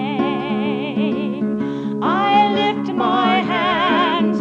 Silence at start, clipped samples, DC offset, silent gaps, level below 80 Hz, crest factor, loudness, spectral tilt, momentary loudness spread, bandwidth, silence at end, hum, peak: 0 s; under 0.1%; under 0.1%; none; -60 dBFS; 12 dB; -18 LUFS; -6.5 dB/octave; 7 LU; 7.2 kHz; 0 s; none; -4 dBFS